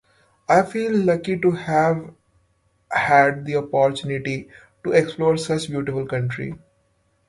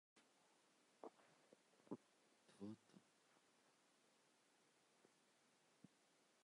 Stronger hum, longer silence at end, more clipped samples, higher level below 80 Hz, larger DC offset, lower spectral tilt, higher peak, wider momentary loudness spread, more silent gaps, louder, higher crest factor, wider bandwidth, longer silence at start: neither; first, 0.7 s vs 0 s; neither; first, -56 dBFS vs under -90 dBFS; neither; about the same, -6 dB/octave vs -5.5 dB/octave; first, -2 dBFS vs -38 dBFS; first, 12 LU vs 5 LU; neither; first, -21 LUFS vs -61 LUFS; second, 20 dB vs 28 dB; about the same, 11.5 kHz vs 11 kHz; first, 0.5 s vs 0.15 s